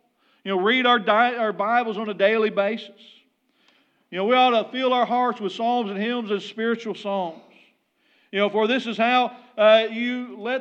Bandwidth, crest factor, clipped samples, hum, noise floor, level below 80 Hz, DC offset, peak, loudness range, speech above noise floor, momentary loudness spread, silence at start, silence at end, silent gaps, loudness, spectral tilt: 8 kHz; 18 dB; under 0.1%; none; -64 dBFS; under -90 dBFS; under 0.1%; -4 dBFS; 5 LU; 43 dB; 10 LU; 0.45 s; 0 s; none; -22 LUFS; -5.5 dB/octave